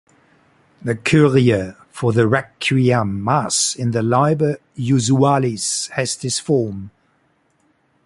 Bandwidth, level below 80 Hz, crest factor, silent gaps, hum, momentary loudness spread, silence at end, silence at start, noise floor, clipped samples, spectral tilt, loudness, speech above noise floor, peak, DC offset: 11.5 kHz; -50 dBFS; 16 dB; none; none; 8 LU; 1.15 s; 0.85 s; -62 dBFS; under 0.1%; -5 dB/octave; -18 LUFS; 45 dB; -2 dBFS; under 0.1%